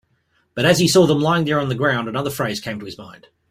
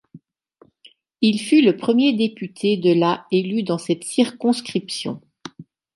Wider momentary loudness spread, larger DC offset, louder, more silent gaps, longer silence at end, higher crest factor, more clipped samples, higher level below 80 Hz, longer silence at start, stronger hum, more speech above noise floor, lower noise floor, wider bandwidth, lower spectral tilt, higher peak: first, 18 LU vs 13 LU; neither; about the same, -18 LUFS vs -20 LUFS; neither; about the same, 0.4 s vs 0.35 s; about the same, 18 dB vs 16 dB; neither; first, -54 dBFS vs -70 dBFS; first, 0.55 s vs 0.15 s; neither; first, 46 dB vs 37 dB; first, -64 dBFS vs -56 dBFS; first, 16 kHz vs 11.5 kHz; about the same, -5 dB/octave vs -5.5 dB/octave; about the same, -2 dBFS vs -4 dBFS